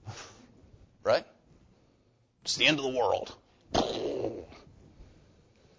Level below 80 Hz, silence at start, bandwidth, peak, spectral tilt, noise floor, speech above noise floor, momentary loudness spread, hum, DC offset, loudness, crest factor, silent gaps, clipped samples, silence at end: -58 dBFS; 0.05 s; 8 kHz; -10 dBFS; -3 dB/octave; -68 dBFS; 39 dB; 21 LU; none; under 0.1%; -29 LUFS; 24 dB; none; under 0.1%; 0.75 s